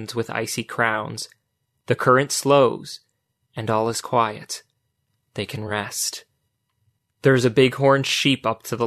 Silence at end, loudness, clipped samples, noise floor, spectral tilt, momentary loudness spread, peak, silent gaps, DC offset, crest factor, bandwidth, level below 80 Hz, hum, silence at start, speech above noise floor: 0 s; -21 LUFS; under 0.1%; -73 dBFS; -4.5 dB/octave; 16 LU; -4 dBFS; none; under 0.1%; 18 dB; 13.5 kHz; -62 dBFS; none; 0 s; 52 dB